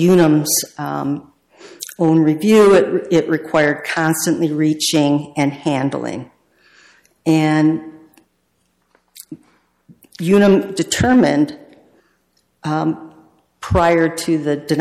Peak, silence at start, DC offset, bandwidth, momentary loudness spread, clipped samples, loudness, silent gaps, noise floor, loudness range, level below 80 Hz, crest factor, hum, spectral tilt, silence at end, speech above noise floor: -4 dBFS; 0 s; under 0.1%; 15.5 kHz; 14 LU; under 0.1%; -16 LUFS; none; -65 dBFS; 7 LU; -44 dBFS; 14 dB; none; -5 dB/octave; 0 s; 50 dB